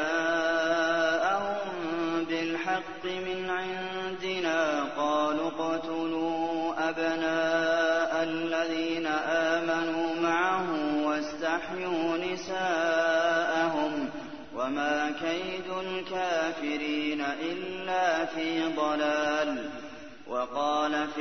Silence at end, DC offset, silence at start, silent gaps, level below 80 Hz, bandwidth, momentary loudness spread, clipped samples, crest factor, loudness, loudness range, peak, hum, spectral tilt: 0 s; 0.3%; 0 s; none; -64 dBFS; 6.6 kHz; 8 LU; under 0.1%; 16 dB; -29 LUFS; 3 LU; -14 dBFS; none; -4 dB/octave